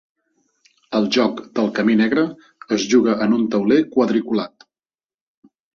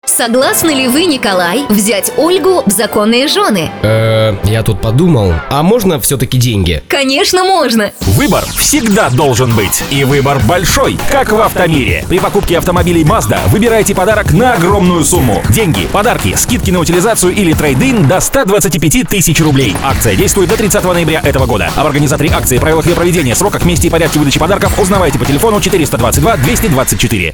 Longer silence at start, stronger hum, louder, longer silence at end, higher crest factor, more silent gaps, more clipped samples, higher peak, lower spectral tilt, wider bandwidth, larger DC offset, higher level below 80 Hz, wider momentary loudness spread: first, 0.9 s vs 0.05 s; neither; second, -18 LUFS vs -9 LUFS; first, 1.3 s vs 0 s; first, 16 dB vs 10 dB; neither; neither; about the same, -2 dBFS vs 0 dBFS; about the same, -5.5 dB/octave vs -4.5 dB/octave; second, 7.2 kHz vs over 20 kHz; neither; second, -62 dBFS vs -24 dBFS; first, 8 LU vs 3 LU